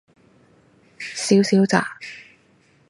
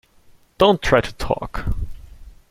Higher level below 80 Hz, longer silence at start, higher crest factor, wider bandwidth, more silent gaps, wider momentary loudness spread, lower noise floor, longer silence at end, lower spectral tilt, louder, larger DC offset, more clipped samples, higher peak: second, -68 dBFS vs -32 dBFS; first, 1 s vs 0.6 s; about the same, 22 dB vs 20 dB; second, 11.5 kHz vs 16.5 kHz; neither; first, 20 LU vs 14 LU; first, -58 dBFS vs -51 dBFS; first, 0.7 s vs 0.2 s; about the same, -5 dB/octave vs -5.5 dB/octave; about the same, -19 LUFS vs -20 LUFS; neither; neither; about the same, 0 dBFS vs -2 dBFS